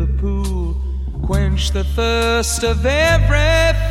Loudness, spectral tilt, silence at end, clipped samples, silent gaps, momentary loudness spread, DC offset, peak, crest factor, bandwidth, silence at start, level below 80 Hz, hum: -17 LUFS; -4.5 dB/octave; 0 s; under 0.1%; none; 9 LU; under 0.1%; -2 dBFS; 14 dB; 15.5 kHz; 0 s; -18 dBFS; none